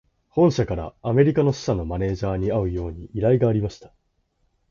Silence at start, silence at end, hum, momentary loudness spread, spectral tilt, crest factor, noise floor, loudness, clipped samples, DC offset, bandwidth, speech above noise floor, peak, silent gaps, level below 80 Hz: 0.35 s; 0.85 s; none; 10 LU; -8 dB/octave; 18 dB; -69 dBFS; -22 LUFS; under 0.1%; under 0.1%; 7.4 kHz; 47 dB; -4 dBFS; none; -40 dBFS